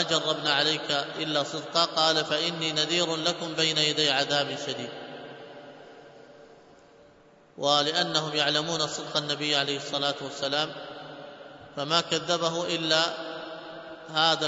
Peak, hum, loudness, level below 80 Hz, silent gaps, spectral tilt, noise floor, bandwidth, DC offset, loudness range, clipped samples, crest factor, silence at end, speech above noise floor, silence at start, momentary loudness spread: -6 dBFS; none; -26 LUFS; -72 dBFS; none; -2.5 dB/octave; -56 dBFS; 8 kHz; under 0.1%; 6 LU; under 0.1%; 22 dB; 0 s; 29 dB; 0 s; 19 LU